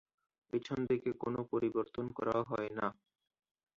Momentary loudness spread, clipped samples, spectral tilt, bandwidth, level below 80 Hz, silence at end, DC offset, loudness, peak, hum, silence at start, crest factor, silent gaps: 6 LU; under 0.1%; -6 dB/octave; 7.2 kHz; -70 dBFS; 0.85 s; under 0.1%; -38 LUFS; -20 dBFS; none; 0.55 s; 18 dB; none